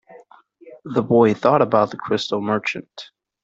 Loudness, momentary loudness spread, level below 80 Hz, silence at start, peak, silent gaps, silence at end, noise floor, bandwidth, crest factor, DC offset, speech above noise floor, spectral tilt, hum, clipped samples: -19 LUFS; 20 LU; -62 dBFS; 0.1 s; -2 dBFS; none; 0.4 s; -49 dBFS; 7.8 kHz; 18 dB; under 0.1%; 30 dB; -6.5 dB/octave; none; under 0.1%